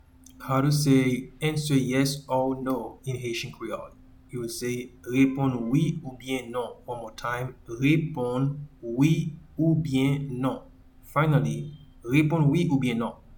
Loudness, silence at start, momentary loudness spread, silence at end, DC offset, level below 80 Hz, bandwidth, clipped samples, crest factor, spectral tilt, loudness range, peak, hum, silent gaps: -26 LUFS; 0.4 s; 13 LU; 0 s; under 0.1%; -52 dBFS; 19 kHz; under 0.1%; 18 dB; -6.5 dB/octave; 4 LU; -8 dBFS; none; none